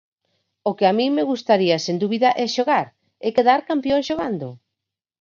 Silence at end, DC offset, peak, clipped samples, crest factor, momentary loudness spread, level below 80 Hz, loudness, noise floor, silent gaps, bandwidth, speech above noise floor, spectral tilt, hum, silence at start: 0.65 s; under 0.1%; -2 dBFS; under 0.1%; 18 dB; 10 LU; -60 dBFS; -20 LUFS; -84 dBFS; none; 7.4 kHz; 65 dB; -5 dB/octave; none; 0.65 s